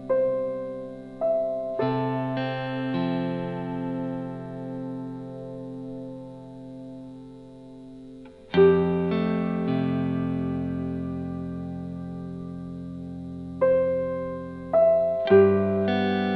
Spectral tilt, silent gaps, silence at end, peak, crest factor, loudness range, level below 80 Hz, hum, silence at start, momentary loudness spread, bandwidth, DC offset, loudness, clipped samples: -9.5 dB/octave; none; 0 s; -6 dBFS; 20 dB; 14 LU; -52 dBFS; none; 0 s; 21 LU; 5.6 kHz; under 0.1%; -26 LUFS; under 0.1%